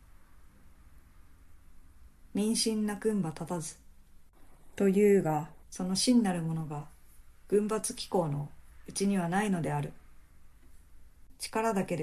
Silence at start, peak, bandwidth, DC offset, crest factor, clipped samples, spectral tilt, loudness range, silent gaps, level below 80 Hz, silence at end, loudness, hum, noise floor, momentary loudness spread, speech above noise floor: 0.2 s; -14 dBFS; 14 kHz; under 0.1%; 18 dB; under 0.1%; -5 dB/octave; 5 LU; none; -58 dBFS; 0 s; -31 LUFS; none; -55 dBFS; 16 LU; 25 dB